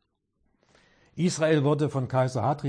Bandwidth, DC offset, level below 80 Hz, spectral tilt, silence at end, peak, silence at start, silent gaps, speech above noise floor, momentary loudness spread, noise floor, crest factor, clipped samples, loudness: 10.5 kHz; under 0.1%; -66 dBFS; -6.5 dB/octave; 0 s; -10 dBFS; 1.15 s; none; 49 dB; 6 LU; -73 dBFS; 16 dB; under 0.1%; -25 LUFS